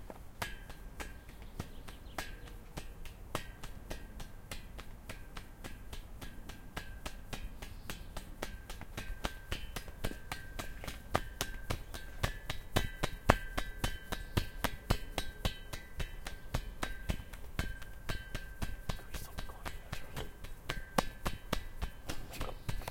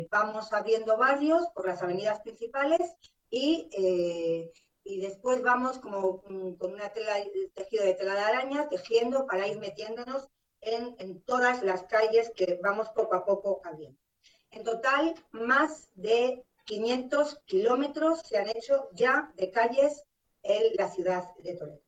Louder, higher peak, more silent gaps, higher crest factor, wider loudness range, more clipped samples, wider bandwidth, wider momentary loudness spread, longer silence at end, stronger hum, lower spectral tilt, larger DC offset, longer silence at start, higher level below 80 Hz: second, -42 LUFS vs -29 LUFS; first, -2 dBFS vs -14 dBFS; neither; first, 38 dB vs 16 dB; first, 11 LU vs 3 LU; neither; first, 17 kHz vs 9.2 kHz; about the same, 13 LU vs 12 LU; about the same, 0 s vs 0.1 s; neither; about the same, -4 dB/octave vs -4.5 dB/octave; neither; about the same, 0 s vs 0 s; first, -44 dBFS vs -70 dBFS